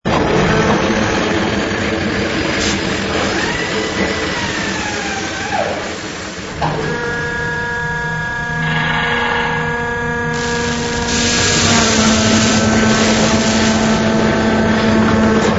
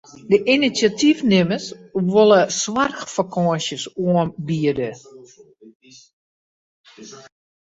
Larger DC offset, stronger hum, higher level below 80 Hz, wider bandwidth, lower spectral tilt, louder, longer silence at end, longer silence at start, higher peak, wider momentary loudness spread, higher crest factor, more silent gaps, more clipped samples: neither; neither; first, -32 dBFS vs -58 dBFS; about the same, 8 kHz vs 8 kHz; about the same, -4 dB/octave vs -5 dB/octave; first, -15 LUFS vs -19 LUFS; second, 0 s vs 0.5 s; second, 0.05 s vs 0.25 s; about the same, 0 dBFS vs -2 dBFS; second, 7 LU vs 11 LU; about the same, 16 dB vs 18 dB; second, none vs 5.75-5.80 s, 6.13-6.84 s; neither